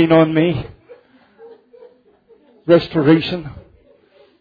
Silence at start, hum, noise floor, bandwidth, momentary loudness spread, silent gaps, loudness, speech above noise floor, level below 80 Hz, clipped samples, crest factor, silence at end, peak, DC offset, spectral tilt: 0 s; none; -52 dBFS; 5 kHz; 20 LU; none; -15 LUFS; 38 dB; -48 dBFS; under 0.1%; 16 dB; 0.8 s; -2 dBFS; under 0.1%; -9.5 dB/octave